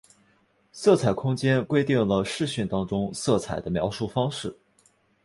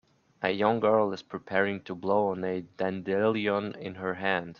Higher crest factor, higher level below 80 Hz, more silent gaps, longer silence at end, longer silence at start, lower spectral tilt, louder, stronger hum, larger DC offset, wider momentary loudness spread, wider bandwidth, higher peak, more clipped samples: about the same, 20 dB vs 20 dB; first, -52 dBFS vs -70 dBFS; neither; first, 0.7 s vs 0.05 s; first, 0.75 s vs 0.4 s; second, -6 dB/octave vs -7.5 dB/octave; first, -25 LUFS vs -29 LUFS; neither; neither; about the same, 7 LU vs 9 LU; first, 11.5 kHz vs 7 kHz; about the same, -6 dBFS vs -8 dBFS; neither